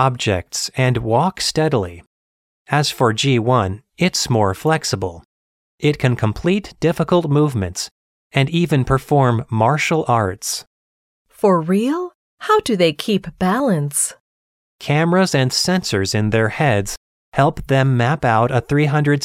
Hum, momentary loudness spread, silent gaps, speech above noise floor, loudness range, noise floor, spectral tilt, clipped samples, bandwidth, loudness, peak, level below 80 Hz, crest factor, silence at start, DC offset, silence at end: none; 8 LU; 2.07-2.65 s, 5.25-5.78 s, 7.91-8.30 s, 10.67-11.25 s, 12.15-12.37 s, 14.20-14.79 s, 16.97-17.32 s; over 73 dB; 2 LU; under -90 dBFS; -5 dB/octave; under 0.1%; 16 kHz; -18 LUFS; 0 dBFS; -44 dBFS; 18 dB; 0 s; under 0.1%; 0 s